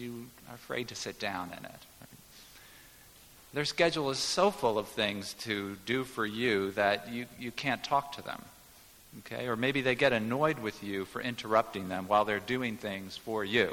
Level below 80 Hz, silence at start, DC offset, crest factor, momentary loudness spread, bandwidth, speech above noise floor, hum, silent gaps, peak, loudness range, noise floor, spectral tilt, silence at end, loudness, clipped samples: -64 dBFS; 0 s; under 0.1%; 20 dB; 21 LU; 18 kHz; 25 dB; none; none; -12 dBFS; 5 LU; -57 dBFS; -4 dB/octave; 0 s; -32 LUFS; under 0.1%